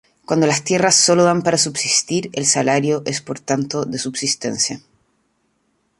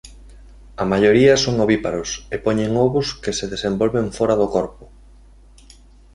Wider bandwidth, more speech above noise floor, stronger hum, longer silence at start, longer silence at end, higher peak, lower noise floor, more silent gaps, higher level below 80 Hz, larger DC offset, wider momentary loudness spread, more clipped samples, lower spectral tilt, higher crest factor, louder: about the same, 11.5 kHz vs 11.5 kHz; first, 48 dB vs 28 dB; neither; first, 0.3 s vs 0.05 s; about the same, 1.2 s vs 1.3 s; about the same, 0 dBFS vs -2 dBFS; first, -66 dBFS vs -46 dBFS; neither; second, -60 dBFS vs -42 dBFS; neither; about the same, 10 LU vs 11 LU; neither; second, -3 dB/octave vs -5 dB/octave; about the same, 18 dB vs 18 dB; about the same, -17 LUFS vs -18 LUFS